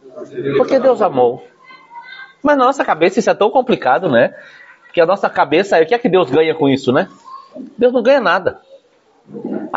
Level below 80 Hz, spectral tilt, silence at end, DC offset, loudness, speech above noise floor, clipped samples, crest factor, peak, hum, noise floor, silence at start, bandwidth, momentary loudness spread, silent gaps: -60 dBFS; -4 dB/octave; 0 s; under 0.1%; -14 LUFS; 39 dB; under 0.1%; 14 dB; 0 dBFS; none; -53 dBFS; 0.05 s; 8 kHz; 17 LU; none